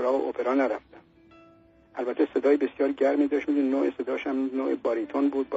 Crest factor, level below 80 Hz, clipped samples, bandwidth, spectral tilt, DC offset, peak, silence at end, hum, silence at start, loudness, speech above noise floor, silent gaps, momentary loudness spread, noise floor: 16 dB; -68 dBFS; under 0.1%; 7.6 kHz; -3.5 dB/octave; under 0.1%; -12 dBFS; 0 s; none; 0 s; -26 LUFS; 31 dB; none; 7 LU; -57 dBFS